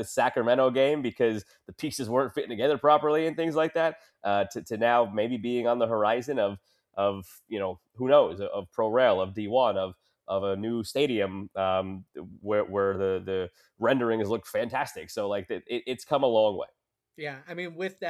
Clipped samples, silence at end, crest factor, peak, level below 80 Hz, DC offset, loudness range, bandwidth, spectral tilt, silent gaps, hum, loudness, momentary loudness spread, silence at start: under 0.1%; 0 s; 20 dB; -8 dBFS; -68 dBFS; under 0.1%; 4 LU; 14.5 kHz; -5.5 dB/octave; none; none; -27 LUFS; 14 LU; 0 s